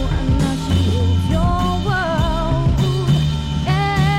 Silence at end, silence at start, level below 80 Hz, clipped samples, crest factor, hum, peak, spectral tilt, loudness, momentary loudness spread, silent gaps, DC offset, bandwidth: 0 s; 0 s; -24 dBFS; under 0.1%; 12 dB; none; -6 dBFS; -6.5 dB/octave; -18 LUFS; 2 LU; none; 0.6%; 14.5 kHz